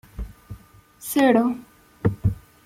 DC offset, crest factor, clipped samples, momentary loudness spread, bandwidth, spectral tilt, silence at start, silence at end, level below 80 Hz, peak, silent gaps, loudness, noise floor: under 0.1%; 20 dB; under 0.1%; 25 LU; 16.5 kHz; -6.5 dB/octave; 0.2 s; 0.3 s; -40 dBFS; -4 dBFS; none; -22 LUFS; -49 dBFS